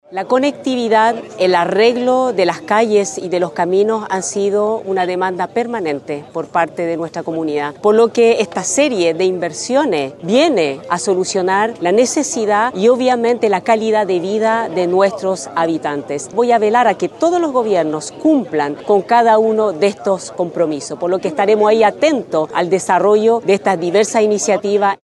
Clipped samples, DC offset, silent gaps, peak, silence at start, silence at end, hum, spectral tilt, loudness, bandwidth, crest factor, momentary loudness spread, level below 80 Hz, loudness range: under 0.1%; under 0.1%; none; 0 dBFS; 0.1 s; 0.1 s; none; -4 dB/octave; -15 LUFS; 12 kHz; 14 dB; 7 LU; -64 dBFS; 3 LU